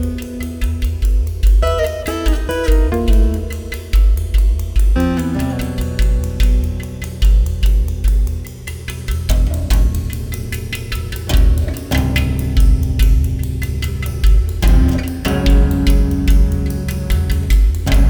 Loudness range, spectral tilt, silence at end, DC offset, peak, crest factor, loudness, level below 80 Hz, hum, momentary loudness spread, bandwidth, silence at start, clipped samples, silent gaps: 3 LU; -6 dB/octave; 0 s; under 0.1%; -2 dBFS; 12 dB; -17 LUFS; -14 dBFS; none; 9 LU; 20 kHz; 0 s; under 0.1%; none